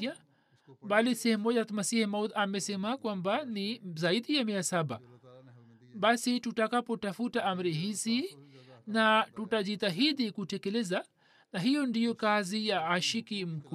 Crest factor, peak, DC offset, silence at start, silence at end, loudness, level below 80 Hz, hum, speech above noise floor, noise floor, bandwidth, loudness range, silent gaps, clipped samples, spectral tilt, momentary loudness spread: 20 dB; -12 dBFS; under 0.1%; 0 s; 0 s; -31 LUFS; -82 dBFS; none; 35 dB; -66 dBFS; 14 kHz; 2 LU; none; under 0.1%; -4 dB/octave; 8 LU